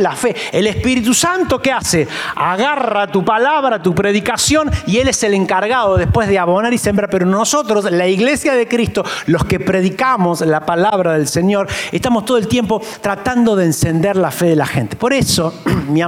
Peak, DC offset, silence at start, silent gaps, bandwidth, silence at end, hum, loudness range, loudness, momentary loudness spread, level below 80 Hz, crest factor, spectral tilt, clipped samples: -2 dBFS; under 0.1%; 0 s; none; 17 kHz; 0 s; none; 1 LU; -14 LUFS; 4 LU; -38 dBFS; 12 dB; -4.5 dB/octave; under 0.1%